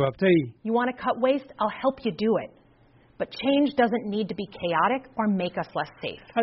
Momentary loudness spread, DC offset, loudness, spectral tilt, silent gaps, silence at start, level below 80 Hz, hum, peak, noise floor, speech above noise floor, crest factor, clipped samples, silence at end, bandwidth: 10 LU; under 0.1%; -26 LUFS; -4.5 dB/octave; none; 0 s; -62 dBFS; none; -8 dBFS; -58 dBFS; 33 dB; 16 dB; under 0.1%; 0 s; 5.8 kHz